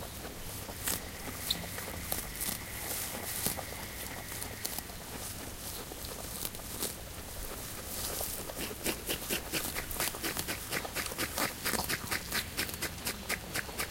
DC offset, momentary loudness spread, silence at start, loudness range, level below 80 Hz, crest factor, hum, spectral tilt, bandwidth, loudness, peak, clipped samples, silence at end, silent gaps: under 0.1%; 7 LU; 0 s; 5 LU; -50 dBFS; 28 dB; none; -2 dB/octave; 17 kHz; -36 LUFS; -10 dBFS; under 0.1%; 0 s; none